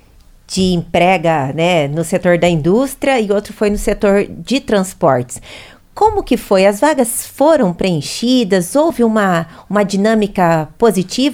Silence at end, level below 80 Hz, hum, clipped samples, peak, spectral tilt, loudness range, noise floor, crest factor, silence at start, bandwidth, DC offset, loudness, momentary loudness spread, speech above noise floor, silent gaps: 0 s; -36 dBFS; none; under 0.1%; 0 dBFS; -5 dB/octave; 2 LU; -44 dBFS; 14 dB; 0.5 s; 18 kHz; under 0.1%; -14 LUFS; 6 LU; 30 dB; none